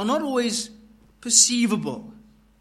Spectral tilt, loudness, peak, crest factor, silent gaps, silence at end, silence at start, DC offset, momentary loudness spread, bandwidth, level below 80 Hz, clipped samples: -2 dB/octave; -20 LUFS; -4 dBFS; 20 dB; none; 0.5 s; 0 s; under 0.1%; 21 LU; 14 kHz; -60 dBFS; under 0.1%